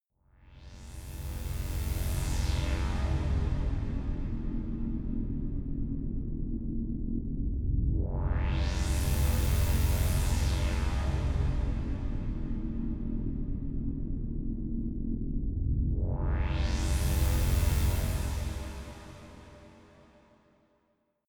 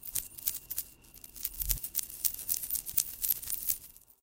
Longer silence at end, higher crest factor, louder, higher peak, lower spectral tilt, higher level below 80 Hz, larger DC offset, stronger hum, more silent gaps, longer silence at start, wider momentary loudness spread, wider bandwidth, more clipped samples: first, 1.55 s vs 0.25 s; second, 16 dB vs 34 dB; about the same, -33 LUFS vs -32 LUFS; second, -14 dBFS vs -2 dBFS; first, -6 dB/octave vs 0 dB/octave; first, -32 dBFS vs -50 dBFS; neither; neither; neither; first, 0.45 s vs 0 s; about the same, 9 LU vs 10 LU; first, over 20 kHz vs 17 kHz; neither